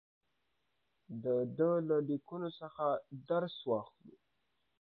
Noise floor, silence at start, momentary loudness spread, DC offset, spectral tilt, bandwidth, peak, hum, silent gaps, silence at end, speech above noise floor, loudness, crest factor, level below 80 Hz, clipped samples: -83 dBFS; 1.1 s; 10 LU; under 0.1%; -6.5 dB/octave; 4.6 kHz; -20 dBFS; none; none; 0.75 s; 47 dB; -36 LUFS; 18 dB; -84 dBFS; under 0.1%